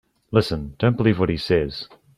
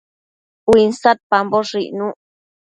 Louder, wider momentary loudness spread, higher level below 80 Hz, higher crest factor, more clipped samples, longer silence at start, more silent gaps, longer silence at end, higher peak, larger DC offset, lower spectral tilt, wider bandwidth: second, -22 LUFS vs -16 LUFS; about the same, 9 LU vs 11 LU; first, -42 dBFS vs -50 dBFS; about the same, 18 dB vs 18 dB; neither; second, 0.3 s vs 0.65 s; second, none vs 1.23-1.30 s; second, 0.3 s vs 0.5 s; about the same, -2 dBFS vs 0 dBFS; neither; first, -7.5 dB/octave vs -5 dB/octave; first, 12.5 kHz vs 11 kHz